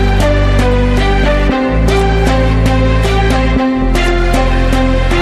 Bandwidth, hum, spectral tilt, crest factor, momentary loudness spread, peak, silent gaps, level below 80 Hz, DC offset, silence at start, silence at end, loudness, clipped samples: 12.5 kHz; none; -6.5 dB/octave; 10 dB; 1 LU; 0 dBFS; none; -14 dBFS; under 0.1%; 0 s; 0 s; -12 LUFS; under 0.1%